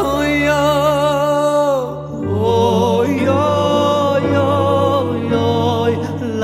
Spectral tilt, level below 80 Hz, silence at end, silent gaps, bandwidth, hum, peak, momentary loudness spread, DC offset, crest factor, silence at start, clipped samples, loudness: -6 dB/octave; -42 dBFS; 0 s; none; 16 kHz; none; -2 dBFS; 4 LU; under 0.1%; 14 dB; 0 s; under 0.1%; -15 LUFS